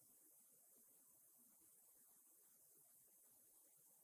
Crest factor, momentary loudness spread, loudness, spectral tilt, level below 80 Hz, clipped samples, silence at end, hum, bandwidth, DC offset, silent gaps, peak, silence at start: 14 dB; 1 LU; -69 LUFS; -1 dB/octave; under -90 dBFS; under 0.1%; 0 s; none; 16 kHz; under 0.1%; none; -58 dBFS; 0 s